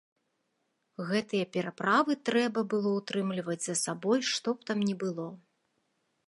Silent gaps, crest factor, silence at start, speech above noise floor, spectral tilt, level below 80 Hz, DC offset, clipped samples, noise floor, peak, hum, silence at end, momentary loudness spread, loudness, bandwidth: none; 20 dB; 1 s; 48 dB; -4 dB/octave; -80 dBFS; under 0.1%; under 0.1%; -78 dBFS; -12 dBFS; none; 0.9 s; 8 LU; -30 LUFS; 11.5 kHz